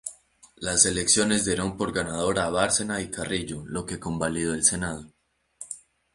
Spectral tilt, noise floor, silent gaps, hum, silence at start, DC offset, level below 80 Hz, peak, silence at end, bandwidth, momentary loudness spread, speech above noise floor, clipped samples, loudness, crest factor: -2.5 dB/octave; -55 dBFS; none; none; 0.05 s; under 0.1%; -50 dBFS; -4 dBFS; 0.35 s; 11.5 kHz; 18 LU; 29 dB; under 0.1%; -24 LUFS; 24 dB